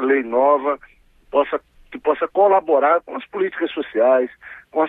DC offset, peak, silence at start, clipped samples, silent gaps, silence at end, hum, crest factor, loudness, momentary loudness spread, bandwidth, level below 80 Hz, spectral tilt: under 0.1%; -4 dBFS; 0 s; under 0.1%; none; 0 s; none; 16 dB; -19 LUFS; 12 LU; 4 kHz; -58 dBFS; -7 dB/octave